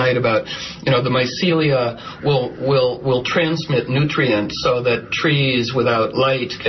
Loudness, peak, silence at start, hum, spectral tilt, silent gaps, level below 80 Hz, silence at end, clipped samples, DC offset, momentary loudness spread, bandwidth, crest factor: -18 LUFS; -4 dBFS; 0 s; none; -6 dB/octave; none; -50 dBFS; 0 s; under 0.1%; under 0.1%; 4 LU; 6.2 kHz; 14 dB